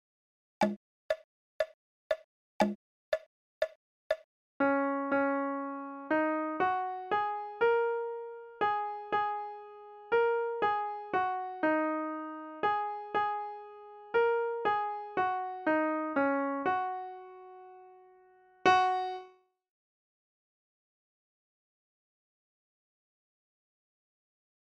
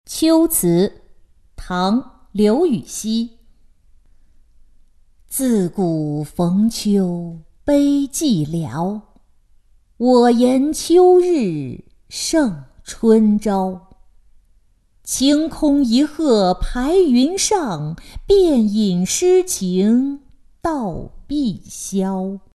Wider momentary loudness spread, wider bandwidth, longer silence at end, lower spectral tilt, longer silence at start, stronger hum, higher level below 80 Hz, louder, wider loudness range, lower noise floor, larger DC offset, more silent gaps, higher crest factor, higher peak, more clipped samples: about the same, 14 LU vs 14 LU; second, 10.5 kHz vs 12.5 kHz; first, 5.35 s vs 0.2 s; about the same, -5.5 dB/octave vs -5.5 dB/octave; first, 0.6 s vs 0.1 s; neither; second, -74 dBFS vs -40 dBFS; second, -32 LUFS vs -17 LUFS; about the same, 5 LU vs 6 LU; first, -62 dBFS vs -55 dBFS; neither; first, 0.76-1.09 s, 1.24-1.60 s, 1.74-2.10 s, 2.24-2.60 s, 2.75-3.12 s, 3.26-3.61 s, 3.75-4.10 s, 4.24-4.60 s vs none; first, 22 dB vs 16 dB; second, -12 dBFS vs -2 dBFS; neither